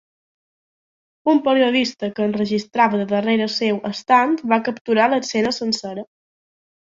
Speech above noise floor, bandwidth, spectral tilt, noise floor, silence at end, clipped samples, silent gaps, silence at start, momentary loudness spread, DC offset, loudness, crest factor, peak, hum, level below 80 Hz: over 71 dB; 7.8 kHz; -4.5 dB/octave; under -90 dBFS; 0.9 s; under 0.1%; 4.81-4.85 s; 1.25 s; 7 LU; under 0.1%; -19 LUFS; 18 dB; -2 dBFS; none; -64 dBFS